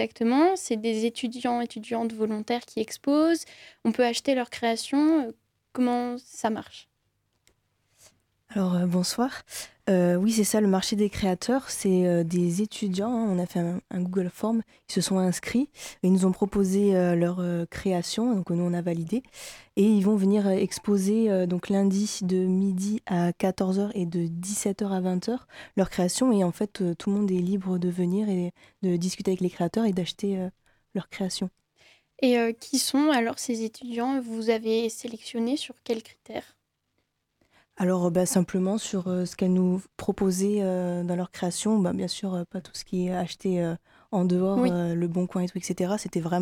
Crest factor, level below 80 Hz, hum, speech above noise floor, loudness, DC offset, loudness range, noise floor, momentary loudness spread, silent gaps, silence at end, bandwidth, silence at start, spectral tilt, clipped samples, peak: 16 dB; -60 dBFS; none; 51 dB; -26 LUFS; under 0.1%; 5 LU; -76 dBFS; 9 LU; none; 0 s; 16 kHz; 0 s; -5.5 dB/octave; under 0.1%; -10 dBFS